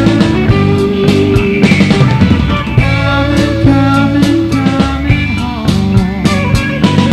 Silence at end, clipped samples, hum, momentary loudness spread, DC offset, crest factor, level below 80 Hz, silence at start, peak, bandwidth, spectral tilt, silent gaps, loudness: 0 s; 0.7%; none; 4 LU; under 0.1%; 10 dB; -22 dBFS; 0 s; 0 dBFS; 13.5 kHz; -7 dB/octave; none; -10 LUFS